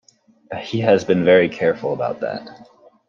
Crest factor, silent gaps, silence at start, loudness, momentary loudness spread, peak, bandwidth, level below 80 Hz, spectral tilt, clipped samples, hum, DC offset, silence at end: 18 dB; none; 0.5 s; -18 LUFS; 17 LU; -2 dBFS; 7.2 kHz; -62 dBFS; -6.5 dB/octave; under 0.1%; none; under 0.1%; 0.45 s